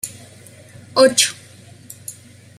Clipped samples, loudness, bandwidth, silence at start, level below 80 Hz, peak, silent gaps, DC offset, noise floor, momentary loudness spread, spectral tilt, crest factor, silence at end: under 0.1%; -15 LUFS; 15 kHz; 0.05 s; -64 dBFS; 0 dBFS; none; under 0.1%; -43 dBFS; 24 LU; -1.5 dB/octave; 20 dB; 0.45 s